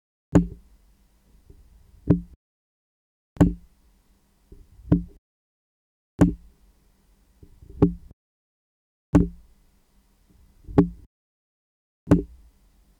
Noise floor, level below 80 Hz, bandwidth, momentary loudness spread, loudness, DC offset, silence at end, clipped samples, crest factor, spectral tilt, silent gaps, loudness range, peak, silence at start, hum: -62 dBFS; -40 dBFS; 10.5 kHz; 21 LU; -23 LUFS; under 0.1%; 0.75 s; under 0.1%; 22 dB; -9.5 dB/octave; 2.36-3.36 s, 5.18-6.19 s, 8.13-9.13 s, 11.06-12.07 s; 1 LU; -6 dBFS; 0.35 s; none